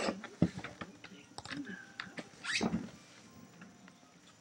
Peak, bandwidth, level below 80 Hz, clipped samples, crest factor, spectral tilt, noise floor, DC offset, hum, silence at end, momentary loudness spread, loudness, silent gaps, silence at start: -14 dBFS; 16 kHz; -66 dBFS; under 0.1%; 28 dB; -4.5 dB/octave; -61 dBFS; under 0.1%; none; 0.05 s; 21 LU; -40 LUFS; none; 0 s